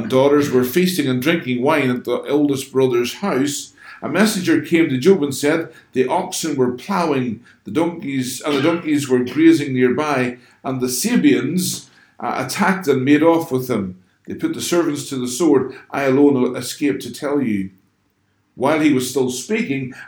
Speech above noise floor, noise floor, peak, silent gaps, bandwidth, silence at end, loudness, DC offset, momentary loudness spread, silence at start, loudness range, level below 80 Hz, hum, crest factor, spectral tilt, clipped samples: 46 dB; -64 dBFS; -2 dBFS; none; over 20 kHz; 0 s; -18 LUFS; under 0.1%; 10 LU; 0 s; 3 LU; -64 dBFS; none; 16 dB; -5 dB/octave; under 0.1%